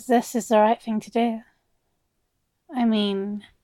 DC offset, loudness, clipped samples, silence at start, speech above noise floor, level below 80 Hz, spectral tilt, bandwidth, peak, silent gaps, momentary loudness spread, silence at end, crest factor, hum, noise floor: under 0.1%; -23 LUFS; under 0.1%; 0 s; 51 dB; -68 dBFS; -5 dB/octave; 15.5 kHz; -6 dBFS; none; 13 LU; 0.25 s; 18 dB; none; -74 dBFS